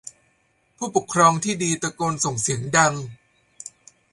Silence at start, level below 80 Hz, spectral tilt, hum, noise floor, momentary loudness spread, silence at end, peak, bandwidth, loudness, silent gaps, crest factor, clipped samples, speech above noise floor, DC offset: 0.05 s; -58 dBFS; -3.5 dB/octave; none; -65 dBFS; 22 LU; 0.45 s; -2 dBFS; 11.5 kHz; -21 LUFS; none; 20 dB; under 0.1%; 44 dB; under 0.1%